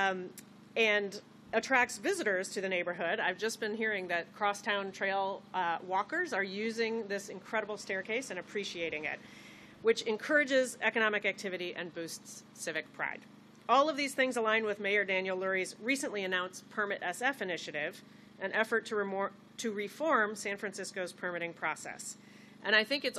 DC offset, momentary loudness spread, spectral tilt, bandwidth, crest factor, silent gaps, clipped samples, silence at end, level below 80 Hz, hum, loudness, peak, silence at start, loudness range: under 0.1%; 12 LU; -3 dB/octave; 14 kHz; 22 dB; none; under 0.1%; 0 s; -82 dBFS; 50 Hz at -65 dBFS; -33 LUFS; -12 dBFS; 0 s; 4 LU